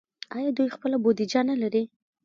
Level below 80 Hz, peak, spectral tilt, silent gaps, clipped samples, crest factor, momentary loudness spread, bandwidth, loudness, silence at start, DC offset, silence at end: -76 dBFS; -10 dBFS; -5.5 dB/octave; none; under 0.1%; 16 dB; 8 LU; 7.6 kHz; -26 LUFS; 0.3 s; under 0.1%; 0.4 s